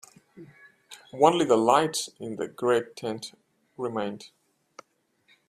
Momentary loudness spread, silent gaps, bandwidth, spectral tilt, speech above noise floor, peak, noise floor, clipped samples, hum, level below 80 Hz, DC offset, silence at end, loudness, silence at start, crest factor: 21 LU; none; 15 kHz; -4 dB/octave; 43 dB; -4 dBFS; -69 dBFS; under 0.1%; none; -72 dBFS; under 0.1%; 1.2 s; -26 LUFS; 0.35 s; 24 dB